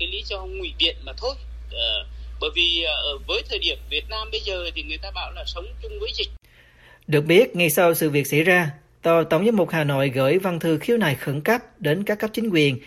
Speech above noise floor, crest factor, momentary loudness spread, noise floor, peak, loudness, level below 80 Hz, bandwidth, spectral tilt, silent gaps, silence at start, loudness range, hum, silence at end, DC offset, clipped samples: 30 dB; 18 dB; 13 LU; -52 dBFS; -4 dBFS; -22 LUFS; -38 dBFS; 16 kHz; -4.5 dB/octave; none; 0 s; 8 LU; none; 0 s; under 0.1%; under 0.1%